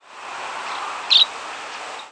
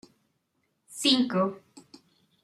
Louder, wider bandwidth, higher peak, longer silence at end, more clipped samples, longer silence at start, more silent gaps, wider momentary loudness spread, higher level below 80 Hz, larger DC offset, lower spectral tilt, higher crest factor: first, -18 LUFS vs -25 LUFS; second, 11 kHz vs 14.5 kHz; first, -4 dBFS vs -10 dBFS; second, 0 s vs 0.65 s; neither; second, 0.05 s vs 0.9 s; neither; second, 18 LU vs 22 LU; about the same, -74 dBFS vs -78 dBFS; neither; second, 1.5 dB/octave vs -4 dB/octave; about the same, 20 dB vs 20 dB